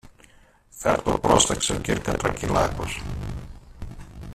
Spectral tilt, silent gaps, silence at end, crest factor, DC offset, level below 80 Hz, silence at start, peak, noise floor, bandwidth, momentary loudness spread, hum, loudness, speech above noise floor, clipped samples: -3.5 dB/octave; none; 0 s; 22 dB; under 0.1%; -38 dBFS; 0.05 s; -4 dBFS; -54 dBFS; 14.5 kHz; 23 LU; none; -23 LUFS; 31 dB; under 0.1%